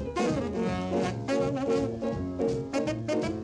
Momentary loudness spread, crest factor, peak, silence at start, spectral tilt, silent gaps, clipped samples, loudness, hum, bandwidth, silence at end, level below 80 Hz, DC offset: 3 LU; 14 dB; -16 dBFS; 0 s; -6.5 dB/octave; none; under 0.1%; -30 LUFS; none; 11 kHz; 0 s; -50 dBFS; under 0.1%